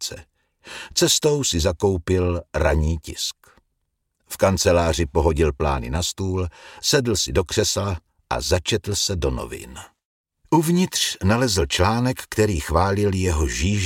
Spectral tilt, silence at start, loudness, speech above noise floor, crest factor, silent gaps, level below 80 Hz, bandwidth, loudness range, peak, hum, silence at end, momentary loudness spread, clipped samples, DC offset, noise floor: -4.5 dB/octave; 0 s; -21 LUFS; 54 dB; 18 dB; 10.05-10.24 s; -32 dBFS; 17 kHz; 3 LU; -4 dBFS; none; 0 s; 11 LU; under 0.1%; under 0.1%; -74 dBFS